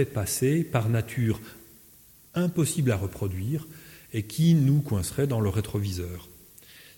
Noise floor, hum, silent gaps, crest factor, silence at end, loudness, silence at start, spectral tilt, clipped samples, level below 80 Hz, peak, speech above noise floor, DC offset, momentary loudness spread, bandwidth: -54 dBFS; none; none; 16 dB; 0.2 s; -27 LUFS; 0 s; -6 dB/octave; under 0.1%; -52 dBFS; -10 dBFS; 29 dB; under 0.1%; 13 LU; 17 kHz